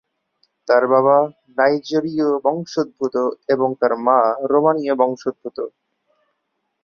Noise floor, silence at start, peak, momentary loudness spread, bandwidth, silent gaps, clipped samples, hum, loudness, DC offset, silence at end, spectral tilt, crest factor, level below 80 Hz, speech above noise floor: -73 dBFS; 0.65 s; -2 dBFS; 12 LU; 7 kHz; none; under 0.1%; none; -18 LUFS; under 0.1%; 1.15 s; -6.5 dB/octave; 18 dB; -68 dBFS; 56 dB